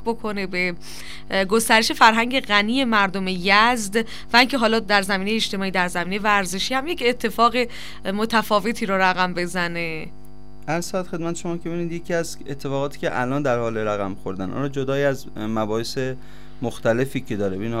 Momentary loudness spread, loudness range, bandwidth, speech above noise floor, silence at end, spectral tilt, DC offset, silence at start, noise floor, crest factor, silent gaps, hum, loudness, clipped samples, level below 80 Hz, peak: 12 LU; 8 LU; 16 kHz; 22 dB; 0 s; -4 dB/octave; 3%; 0 s; -44 dBFS; 22 dB; none; none; -21 LUFS; under 0.1%; -48 dBFS; 0 dBFS